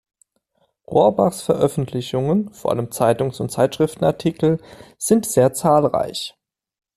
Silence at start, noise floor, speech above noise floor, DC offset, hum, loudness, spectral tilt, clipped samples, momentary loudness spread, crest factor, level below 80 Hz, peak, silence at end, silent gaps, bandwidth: 0.9 s; -67 dBFS; 48 dB; under 0.1%; none; -19 LUFS; -6 dB/octave; under 0.1%; 8 LU; 16 dB; -52 dBFS; -2 dBFS; 0.7 s; none; 14.5 kHz